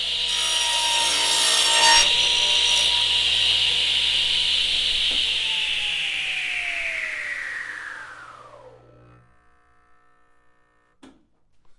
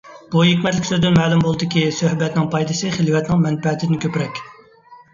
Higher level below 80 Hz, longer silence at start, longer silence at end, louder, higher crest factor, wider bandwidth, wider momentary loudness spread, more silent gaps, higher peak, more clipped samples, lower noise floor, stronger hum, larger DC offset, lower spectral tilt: about the same, -50 dBFS vs -48 dBFS; about the same, 0 s vs 0.05 s; second, 0.05 s vs 0.2 s; about the same, -18 LUFS vs -18 LUFS; about the same, 20 dB vs 16 dB; first, 11.5 kHz vs 7.6 kHz; first, 13 LU vs 7 LU; neither; about the same, -4 dBFS vs -2 dBFS; neither; first, -61 dBFS vs -46 dBFS; neither; neither; second, 1.5 dB/octave vs -6 dB/octave